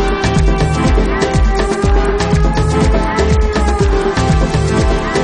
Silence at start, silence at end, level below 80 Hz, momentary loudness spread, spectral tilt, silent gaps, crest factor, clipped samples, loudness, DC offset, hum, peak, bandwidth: 0 s; 0 s; -16 dBFS; 1 LU; -6 dB/octave; none; 12 dB; under 0.1%; -14 LUFS; under 0.1%; none; 0 dBFS; 10.5 kHz